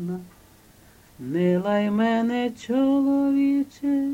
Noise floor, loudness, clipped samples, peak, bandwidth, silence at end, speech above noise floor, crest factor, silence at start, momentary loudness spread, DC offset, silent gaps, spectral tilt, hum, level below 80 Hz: -53 dBFS; -23 LUFS; under 0.1%; -12 dBFS; 15 kHz; 0 s; 30 dB; 12 dB; 0 s; 9 LU; under 0.1%; none; -7.5 dB/octave; none; -60 dBFS